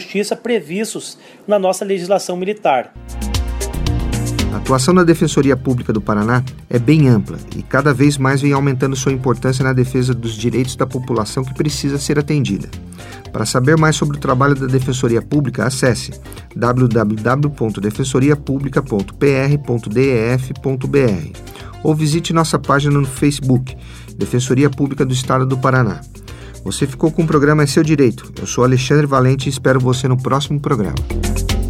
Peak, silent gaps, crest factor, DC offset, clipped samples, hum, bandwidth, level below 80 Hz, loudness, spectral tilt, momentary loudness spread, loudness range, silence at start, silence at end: 0 dBFS; none; 16 dB; under 0.1%; under 0.1%; none; 15.5 kHz; -32 dBFS; -16 LUFS; -6 dB/octave; 11 LU; 4 LU; 0 s; 0 s